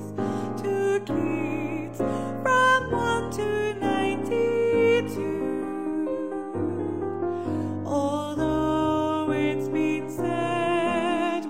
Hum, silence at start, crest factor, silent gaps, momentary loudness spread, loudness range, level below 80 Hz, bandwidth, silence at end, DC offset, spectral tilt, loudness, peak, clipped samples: none; 0 s; 16 dB; none; 8 LU; 4 LU; -52 dBFS; 16 kHz; 0 s; 0.5%; -6 dB/octave; -26 LUFS; -10 dBFS; under 0.1%